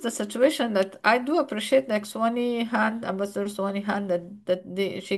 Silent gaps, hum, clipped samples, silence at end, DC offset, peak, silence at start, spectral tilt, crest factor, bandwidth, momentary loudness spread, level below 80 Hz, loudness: none; none; under 0.1%; 0 s; under 0.1%; -8 dBFS; 0 s; -4.5 dB/octave; 18 dB; 12.5 kHz; 7 LU; -72 dBFS; -25 LUFS